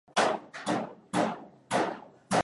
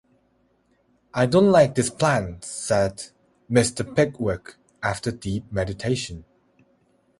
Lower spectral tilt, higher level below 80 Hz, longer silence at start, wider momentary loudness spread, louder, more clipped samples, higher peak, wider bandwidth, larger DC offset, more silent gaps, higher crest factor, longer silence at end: second, -4 dB/octave vs -5.5 dB/octave; second, -72 dBFS vs -48 dBFS; second, 0.15 s vs 1.15 s; second, 7 LU vs 15 LU; second, -31 LUFS vs -23 LUFS; neither; second, -12 dBFS vs -2 dBFS; about the same, 11.5 kHz vs 11.5 kHz; neither; neither; about the same, 18 dB vs 20 dB; second, 0 s vs 1 s